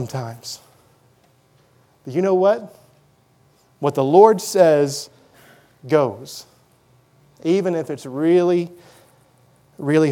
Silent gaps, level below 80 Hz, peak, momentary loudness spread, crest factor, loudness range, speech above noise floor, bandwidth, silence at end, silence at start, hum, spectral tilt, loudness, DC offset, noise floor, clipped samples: none; -72 dBFS; 0 dBFS; 20 LU; 20 dB; 7 LU; 40 dB; 17 kHz; 0 s; 0 s; none; -6 dB/octave; -18 LUFS; under 0.1%; -57 dBFS; under 0.1%